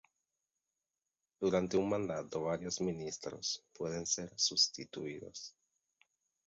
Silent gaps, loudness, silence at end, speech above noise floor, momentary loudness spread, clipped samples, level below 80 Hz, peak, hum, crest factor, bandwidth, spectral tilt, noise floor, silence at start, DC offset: none; -36 LUFS; 1 s; over 53 dB; 13 LU; under 0.1%; -68 dBFS; -18 dBFS; none; 22 dB; 7.6 kHz; -3.5 dB/octave; under -90 dBFS; 1.4 s; under 0.1%